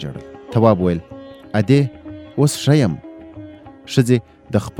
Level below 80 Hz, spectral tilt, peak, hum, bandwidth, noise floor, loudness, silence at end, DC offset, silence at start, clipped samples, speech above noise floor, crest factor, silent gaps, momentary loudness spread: -48 dBFS; -6.5 dB/octave; 0 dBFS; none; 16 kHz; -37 dBFS; -18 LUFS; 0.1 s; under 0.1%; 0 s; under 0.1%; 21 dB; 18 dB; none; 22 LU